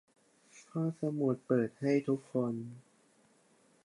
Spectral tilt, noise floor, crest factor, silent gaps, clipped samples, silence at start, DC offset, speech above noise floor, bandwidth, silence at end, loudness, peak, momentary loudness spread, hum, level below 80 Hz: -8.5 dB/octave; -68 dBFS; 20 dB; none; under 0.1%; 0.55 s; under 0.1%; 35 dB; 11.5 kHz; 1.05 s; -34 LUFS; -16 dBFS; 10 LU; none; -80 dBFS